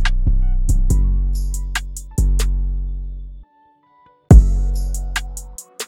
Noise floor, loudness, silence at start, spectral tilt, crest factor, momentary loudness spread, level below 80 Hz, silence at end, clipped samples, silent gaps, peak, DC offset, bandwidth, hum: -55 dBFS; -19 LUFS; 0 s; -5.5 dB/octave; 16 dB; 20 LU; -18 dBFS; 0 s; 0.1%; none; 0 dBFS; under 0.1%; 15 kHz; none